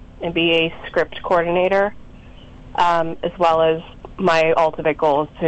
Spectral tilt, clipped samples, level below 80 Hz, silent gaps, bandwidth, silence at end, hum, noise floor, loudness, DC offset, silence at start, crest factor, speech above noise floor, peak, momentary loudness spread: -5.5 dB/octave; under 0.1%; -44 dBFS; none; 8.2 kHz; 0 s; none; -40 dBFS; -18 LUFS; under 0.1%; 0 s; 12 dB; 22 dB; -6 dBFS; 8 LU